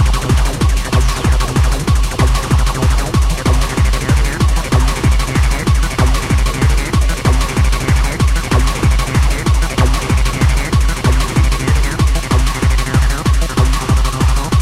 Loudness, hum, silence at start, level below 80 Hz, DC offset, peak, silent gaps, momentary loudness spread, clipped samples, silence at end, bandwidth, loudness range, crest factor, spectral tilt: -15 LUFS; none; 0 s; -14 dBFS; under 0.1%; 0 dBFS; none; 2 LU; under 0.1%; 0 s; 15 kHz; 0 LU; 12 dB; -5 dB/octave